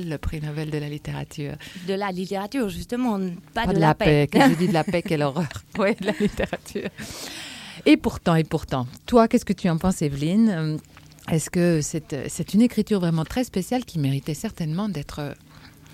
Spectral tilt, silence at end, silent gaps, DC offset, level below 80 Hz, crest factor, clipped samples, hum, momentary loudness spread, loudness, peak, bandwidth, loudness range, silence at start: -6 dB/octave; 0.25 s; none; under 0.1%; -44 dBFS; 18 dB; under 0.1%; none; 14 LU; -23 LUFS; -4 dBFS; 16 kHz; 5 LU; 0 s